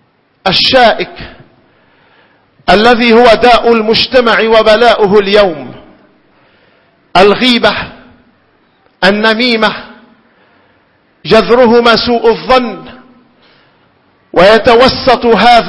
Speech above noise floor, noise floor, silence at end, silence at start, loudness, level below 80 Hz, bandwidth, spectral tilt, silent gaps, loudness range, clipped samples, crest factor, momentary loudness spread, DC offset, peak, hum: 44 dB; -51 dBFS; 0 s; 0.45 s; -7 LUFS; -36 dBFS; 11 kHz; -5 dB/octave; none; 6 LU; 2%; 10 dB; 14 LU; under 0.1%; 0 dBFS; none